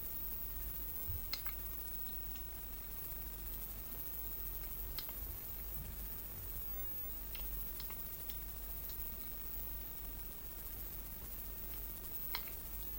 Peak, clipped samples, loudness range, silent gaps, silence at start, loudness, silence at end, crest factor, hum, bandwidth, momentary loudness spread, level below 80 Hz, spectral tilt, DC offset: -22 dBFS; under 0.1%; 2 LU; none; 0 s; -42 LUFS; 0 s; 24 dB; none; 16 kHz; 4 LU; -50 dBFS; -3.5 dB/octave; under 0.1%